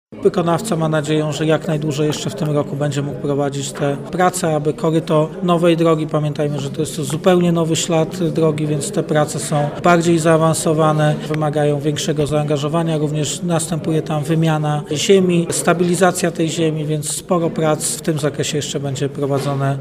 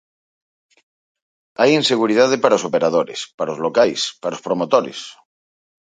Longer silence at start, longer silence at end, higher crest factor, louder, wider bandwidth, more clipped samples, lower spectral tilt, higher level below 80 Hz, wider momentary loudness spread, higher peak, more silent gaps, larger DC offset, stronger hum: second, 0.1 s vs 1.6 s; second, 0 s vs 0.75 s; about the same, 16 dB vs 20 dB; about the same, -17 LUFS vs -17 LUFS; first, 16 kHz vs 9.4 kHz; neither; first, -5.5 dB/octave vs -4 dB/octave; first, -50 dBFS vs -66 dBFS; second, 7 LU vs 13 LU; about the same, 0 dBFS vs 0 dBFS; second, none vs 3.34-3.38 s; neither; neither